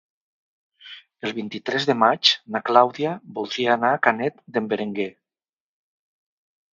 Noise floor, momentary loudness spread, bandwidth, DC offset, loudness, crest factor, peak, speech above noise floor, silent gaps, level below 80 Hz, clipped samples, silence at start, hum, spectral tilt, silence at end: under -90 dBFS; 13 LU; 7.6 kHz; under 0.1%; -22 LUFS; 24 dB; 0 dBFS; over 68 dB; none; -74 dBFS; under 0.1%; 0.85 s; none; -4 dB/octave; 1.65 s